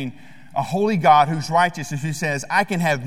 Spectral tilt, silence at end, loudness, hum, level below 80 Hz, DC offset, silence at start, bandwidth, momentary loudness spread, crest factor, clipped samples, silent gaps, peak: -5 dB/octave; 0 s; -20 LUFS; none; -58 dBFS; 0.8%; 0 s; 16 kHz; 12 LU; 18 dB; under 0.1%; none; -2 dBFS